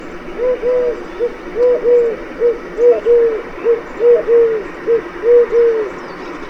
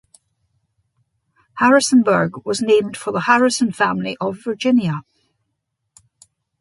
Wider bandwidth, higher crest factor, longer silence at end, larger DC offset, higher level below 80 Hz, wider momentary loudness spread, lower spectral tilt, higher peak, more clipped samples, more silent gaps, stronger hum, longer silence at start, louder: second, 6.4 kHz vs 11.5 kHz; second, 12 dB vs 18 dB; second, 0 s vs 1.6 s; neither; first, -40 dBFS vs -62 dBFS; about the same, 10 LU vs 10 LU; first, -6 dB/octave vs -4.5 dB/octave; about the same, -2 dBFS vs -2 dBFS; neither; neither; neither; second, 0 s vs 1.55 s; first, -14 LUFS vs -17 LUFS